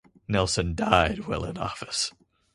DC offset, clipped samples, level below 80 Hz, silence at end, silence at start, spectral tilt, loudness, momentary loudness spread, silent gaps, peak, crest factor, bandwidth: under 0.1%; under 0.1%; -42 dBFS; 0.45 s; 0.3 s; -4 dB/octave; -26 LUFS; 10 LU; none; -2 dBFS; 26 dB; 11.5 kHz